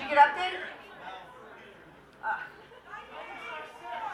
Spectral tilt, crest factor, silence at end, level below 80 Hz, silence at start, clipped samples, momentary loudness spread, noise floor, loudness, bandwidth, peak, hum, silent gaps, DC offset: -3 dB/octave; 24 dB; 0 s; -68 dBFS; 0 s; under 0.1%; 26 LU; -53 dBFS; -30 LUFS; 11.5 kHz; -8 dBFS; none; none; under 0.1%